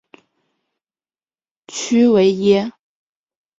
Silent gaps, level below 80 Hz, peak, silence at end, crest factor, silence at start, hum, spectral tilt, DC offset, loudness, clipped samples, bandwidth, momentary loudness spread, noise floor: none; -62 dBFS; -2 dBFS; 0.9 s; 16 dB; 1.7 s; none; -5.5 dB/octave; under 0.1%; -15 LUFS; under 0.1%; 7.8 kHz; 16 LU; under -90 dBFS